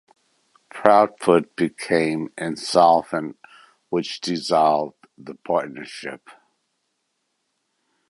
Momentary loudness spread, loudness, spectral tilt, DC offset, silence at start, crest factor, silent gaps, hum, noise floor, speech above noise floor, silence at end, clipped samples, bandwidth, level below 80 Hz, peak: 19 LU; -20 LUFS; -5 dB/octave; under 0.1%; 0.75 s; 22 dB; none; none; -74 dBFS; 54 dB; 1.8 s; under 0.1%; 11.5 kHz; -64 dBFS; 0 dBFS